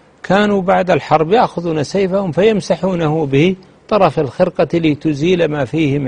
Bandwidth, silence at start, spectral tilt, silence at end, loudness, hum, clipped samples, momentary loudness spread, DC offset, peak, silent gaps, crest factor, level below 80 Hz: 10 kHz; 0.25 s; -7 dB/octave; 0 s; -15 LUFS; none; under 0.1%; 3 LU; under 0.1%; 0 dBFS; none; 14 dB; -44 dBFS